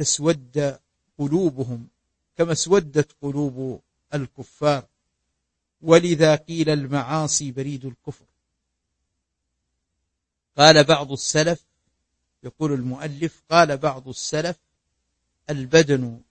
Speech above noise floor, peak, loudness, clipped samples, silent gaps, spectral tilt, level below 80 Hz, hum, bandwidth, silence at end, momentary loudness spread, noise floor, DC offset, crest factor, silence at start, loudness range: 59 dB; 0 dBFS; -21 LUFS; under 0.1%; none; -4 dB/octave; -56 dBFS; none; 8.8 kHz; 0.1 s; 16 LU; -80 dBFS; under 0.1%; 22 dB; 0 s; 7 LU